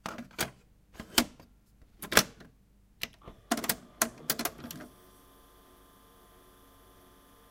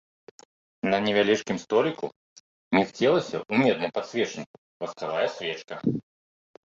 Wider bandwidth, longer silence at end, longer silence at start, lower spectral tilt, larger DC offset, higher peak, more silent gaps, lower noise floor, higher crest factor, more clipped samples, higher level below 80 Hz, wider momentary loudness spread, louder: first, 17 kHz vs 7.8 kHz; first, 2.65 s vs 0.65 s; second, 0.05 s vs 0.85 s; second, -1.5 dB/octave vs -5 dB/octave; neither; first, -2 dBFS vs -6 dBFS; second, none vs 2.16-2.71 s, 4.46-4.80 s; second, -62 dBFS vs under -90 dBFS; first, 36 dB vs 20 dB; neither; first, -58 dBFS vs -66 dBFS; first, 21 LU vs 13 LU; second, -31 LUFS vs -26 LUFS